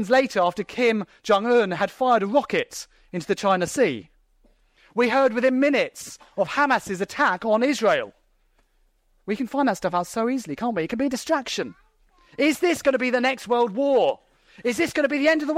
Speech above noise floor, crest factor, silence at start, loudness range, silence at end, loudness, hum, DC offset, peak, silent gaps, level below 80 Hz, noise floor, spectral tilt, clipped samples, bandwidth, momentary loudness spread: 42 dB; 16 dB; 0 s; 4 LU; 0 s; -22 LUFS; none; under 0.1%; -6 dBFS; none; -62 dBFS; -64 dBFS; -4.5 dB/octave; under 0.1%; 16 kHz; 11 LU